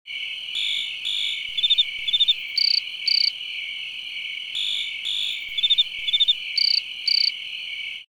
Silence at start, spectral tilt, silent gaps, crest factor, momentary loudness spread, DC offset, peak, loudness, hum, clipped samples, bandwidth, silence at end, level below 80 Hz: 0.05 s; 3 dB/octave; none; 16 dB; 11 LU; under 0.1%; -8 dBFS; -21 LUFS; none; under 0.1%; over 20 kHz; 0.15 s; -68 dBFS